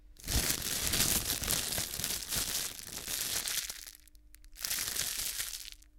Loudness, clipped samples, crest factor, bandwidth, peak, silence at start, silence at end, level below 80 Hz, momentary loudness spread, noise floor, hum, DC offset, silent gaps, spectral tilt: -32 LUFS; under 0.1%; 28 dB; 18 kHz; -8 dBFS; 0 s; 0 s; -48 dBFS; 11 LU; -57 dBFS; none; under 0.1%; none; -1 dB/octave